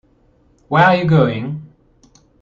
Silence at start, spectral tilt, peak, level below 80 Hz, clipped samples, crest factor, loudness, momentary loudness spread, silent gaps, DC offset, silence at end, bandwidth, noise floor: 0.7 s; -8 dB/octave; 0 dBFS; -50 dBFS; under 0.1%; 16 dB; -14 LUFS; 15 LU; none; under 0.1%; 0.75 s; 6.8 kHz; -55 dBFS